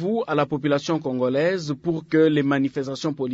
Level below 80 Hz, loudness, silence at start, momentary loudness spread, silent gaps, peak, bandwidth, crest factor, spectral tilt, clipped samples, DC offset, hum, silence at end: -62 dBFS; -23 LUFS; 0 s; 8 LU; none; -8 dBFS; 8 kHz; 14 dB; -6.5 dB/octave; under 0.1%; under 0.1%; none; 0 s